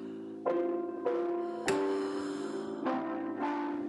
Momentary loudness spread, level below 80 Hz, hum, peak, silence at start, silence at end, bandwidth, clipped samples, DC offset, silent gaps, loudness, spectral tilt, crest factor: 5 LU; -76 dBFS; none; -16 dBFS; 0 s; 0 s; 11.5 kHz; under 0.1%; under 0.1%; none; -34 LUFS; -5 dB/octave; 18 dB